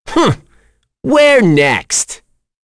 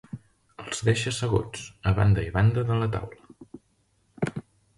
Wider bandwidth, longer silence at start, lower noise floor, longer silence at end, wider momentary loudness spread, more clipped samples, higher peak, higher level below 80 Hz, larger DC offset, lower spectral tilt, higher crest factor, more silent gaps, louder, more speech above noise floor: about the same, 11 kHz vs 11.5 kHz; about the same, 0.05 s vs 0.15 s; second, -54 dBFS vs -68 dBFS; first, 0.5 s vs 0.35 s; second, 16 LU vs 19 LU; neither; first, 0 dBFS vs -8 dBFS; about the same, -42 dBFS vs -42 dBFS; neither; second, -4 dB/octave vs -6 dB/octave; second, 12 dB vs 18 dB; neither; first, -11 LUFS vs -26 LUFS; about the same, 43 dB vs 44 dB